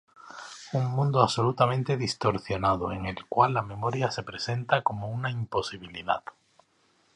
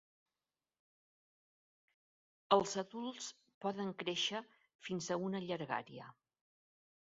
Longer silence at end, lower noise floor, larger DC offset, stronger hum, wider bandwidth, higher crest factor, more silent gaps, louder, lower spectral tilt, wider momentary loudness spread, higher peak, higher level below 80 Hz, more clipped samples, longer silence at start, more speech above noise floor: about the same, 0.95 s vs 1.05 s; second, -67 dBFS vs under -90 dBFS; neither; neither; first, 10.5 kHz vs 7.6 kHz; about the same, 24 dB vs 28 dB; second, none vs 3.54-3.61 s, 4.75-4.79 s; first, -28 LUFS vs -39 LUFS; first, -6 dB/octave vs -3 dB/octave; second, 12 LU vs 16 LU; first, -4 dBFS vs -16 dBFS; first, -54 dBFS vs -82 dBFS; neither; second, 0.25 s vs 2.5 s; second, 40 dB vs over 51 dB